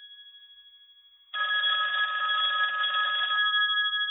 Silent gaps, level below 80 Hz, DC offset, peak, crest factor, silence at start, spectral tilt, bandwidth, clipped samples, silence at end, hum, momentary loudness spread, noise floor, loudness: none; -80 dBFS; under 0.1%; -16 dBFS; 12 dB; 0 s; -0.5 dB/octave; 4 kHz; under 0.1%; 0 s; none; 5 LU; -57 dBFS; -25 LUFS